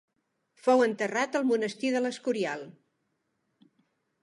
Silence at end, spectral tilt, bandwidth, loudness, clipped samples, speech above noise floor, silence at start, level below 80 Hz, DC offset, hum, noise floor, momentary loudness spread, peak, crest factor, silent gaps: 1.5 s; -4.5 dB/octave; 11.5 kHz; -28 LUFS; under 0.1%; 50 dB; 0.65 s; -86 dBFS; under 0.1%; none; -78 dBFS; 9 LU; -10 dBFS; 20 dB; none